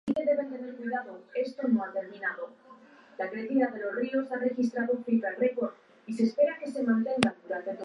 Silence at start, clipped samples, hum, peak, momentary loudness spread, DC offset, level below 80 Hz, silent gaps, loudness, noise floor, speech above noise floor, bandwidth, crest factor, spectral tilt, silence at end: 0.05 s; under 0.1%; none; -6 dBFS; 10 LU; under 0.1%; -72 dBFS; none; -30 LUFS; -54 dBFS; 25 dB; 11 kHz; 24 dB; -6 dB/octave; 0 s